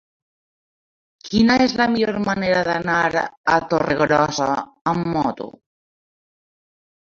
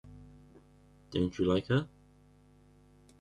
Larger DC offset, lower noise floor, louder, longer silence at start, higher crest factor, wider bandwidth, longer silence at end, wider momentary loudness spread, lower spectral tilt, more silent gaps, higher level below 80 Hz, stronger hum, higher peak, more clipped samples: neither; first, under -90 dBFS vs -61 dBFS; first, -19 LUFS vs -32 LUFS; first, 1.25 s vs 0.05 s; about the same, 20 dB vs 20 dB; second, 7.4 kHz vs 10.5 kHz; first, 1.55 s vs 1.35 s; second, 7 LU vs 24 LU; second, -5.5 dB/octave vs -7.5 dB/octave; first, 3.37-3.44 s, 4.81-4.85 s vs none; first, -50 dBFS vs -62 dBFS; neither; first, -2 dBFS vs -16 dBFS; neither